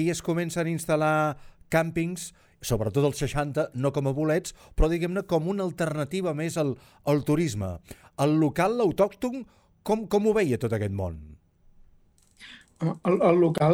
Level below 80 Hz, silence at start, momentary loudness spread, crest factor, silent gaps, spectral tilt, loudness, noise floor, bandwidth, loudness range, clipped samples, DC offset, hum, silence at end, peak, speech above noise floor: -42 dBFS; 0 s; 14 LU; 18 dB; none; -6.5 dB/octave; -26 LUFS; -60 dBFS; 18.5 kHz; 3 LU; under 0.1%; under 0.1%; none; 0 s; -8 dBFS; 34 dB